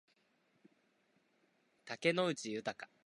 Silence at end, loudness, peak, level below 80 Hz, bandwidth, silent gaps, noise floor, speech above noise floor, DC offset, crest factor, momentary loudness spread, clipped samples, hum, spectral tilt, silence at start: 0.2 s; -37 LUFS; -18 dBFS; -86 dBFS; 11.5 kHz; none; -77 dBFS; 38 dB; under 0.1%; 24 dB; 11 LU; under 0.1%; none; -4.5 dB/octave; 1.85 s